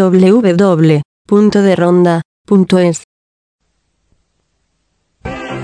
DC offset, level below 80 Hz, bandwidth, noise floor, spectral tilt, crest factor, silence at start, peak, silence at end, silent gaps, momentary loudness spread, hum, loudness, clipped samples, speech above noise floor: under 0.1%; -46 dBFS; 10.5 kHz; -64 dBFS; -7.5 dB/octave; 12 dB; 0 s; 0 dBFS; 0 s; 1.05-1.25 s, 2.25-2.45 s, 3.04-3.59 s; 15 LU; none; -10 LUFS; under 0.1%; 55 dB